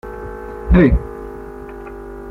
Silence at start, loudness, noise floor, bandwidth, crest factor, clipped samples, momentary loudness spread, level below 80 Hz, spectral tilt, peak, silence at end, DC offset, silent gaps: 0.05 s; -14 LUFS; -32 dBFS; 4.4 kHz; 16 dB; under 0.1%; 20 LU; -24 dBFS; -10 dB/octave; -2 dBFS; 0 s; under 0.1%; none